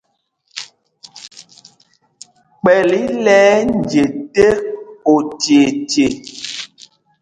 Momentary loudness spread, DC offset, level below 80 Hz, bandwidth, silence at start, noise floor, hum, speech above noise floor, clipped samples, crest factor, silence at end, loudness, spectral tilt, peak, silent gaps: 21 LU; under 0.1%; -48 dBFS; 10 kHz; 0.55 s; -64 dBFS; none; 51 dB; under 0.1%; 16 dB; 0.55 s; -14 LUFS; -4.5 dB/octave; 0 dBFS; none